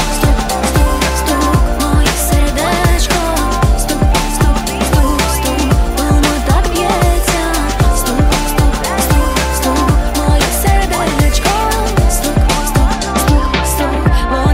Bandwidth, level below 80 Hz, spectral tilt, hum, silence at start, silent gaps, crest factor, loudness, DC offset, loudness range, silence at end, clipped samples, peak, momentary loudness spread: 16.5 kHz; -14 dBFS; -4.5 dB/octave; none; 0 s; none; 12 dB; -13 LUFS; under 0.1%; 0 LU; 0 s; under 0.1%; 0 dBFS; 2 LU